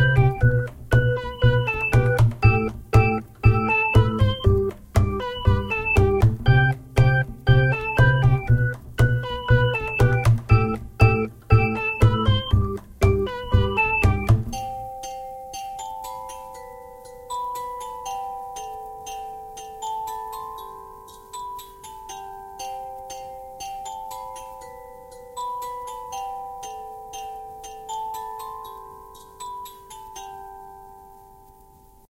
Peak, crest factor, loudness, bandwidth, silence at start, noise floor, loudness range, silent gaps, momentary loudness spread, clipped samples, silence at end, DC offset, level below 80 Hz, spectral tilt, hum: -2 dBFS; 20 dB; -21 LUFS; 15.5 kHz; 0 s; -51 dBFS; 16 LU; none; 20 LU; under 0.1%; 1.05 s; under 0.1%; -32 dBFS; -6.5 dB/octave; none